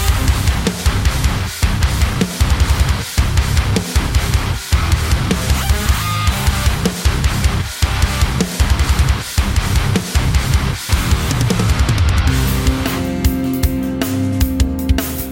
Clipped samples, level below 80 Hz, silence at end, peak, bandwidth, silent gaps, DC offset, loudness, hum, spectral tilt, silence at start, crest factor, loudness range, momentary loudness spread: under 0.1%; -18 dBFS; 0 s; -2 dBFS; 17 kHz; none; under 0.1%; -16 LUFS; none; -4.5 dB/octave; 0 s; 12 dB; 1 LU; 3 LU